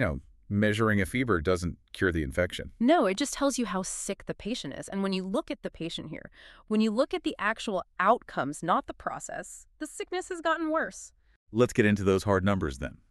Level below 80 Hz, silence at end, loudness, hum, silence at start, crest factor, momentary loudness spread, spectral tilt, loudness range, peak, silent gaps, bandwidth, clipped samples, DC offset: -50 dBFS; 0.2 s; -29 LUFS; none; 0 s; 22 dB; 13 LU; -5 dB/octave; 5 LU; -8 dBFS; 11.36-11.47 s; 13 kHz; under 0.1%; under 0.1%